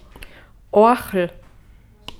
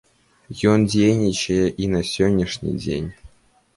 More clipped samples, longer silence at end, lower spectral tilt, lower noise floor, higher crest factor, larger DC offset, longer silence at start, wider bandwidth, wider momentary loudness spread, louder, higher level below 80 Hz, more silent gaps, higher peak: neither; first, 0.9 s vs 0.5 s; about the same, -6 dB/octave vs -6 dB/octave; second, -48 dBFS vs -53 dBFS; about the same, 18 dB vs 16 dB; neither; second, 0.2 s vs 0.5 s; first, 17 kHz vs 11.5 kHz; first, 14 LU vs 10 LU; about the same, -18 LUFS vs -20 LUFS; about the same, -46 dBFS vs -42 dBFS; neither; about the same, -2 dBFS vs -4 dBFS